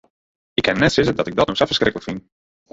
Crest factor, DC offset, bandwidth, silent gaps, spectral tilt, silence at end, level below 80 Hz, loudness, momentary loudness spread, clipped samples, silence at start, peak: 18 dB; under 0.1%; 8 kHz; none; -5 dB/octave; 0.55 s; -44 dBFS; -18 LUFS; 14 LU; under 0.1%; 0.6 s; -2 dBFS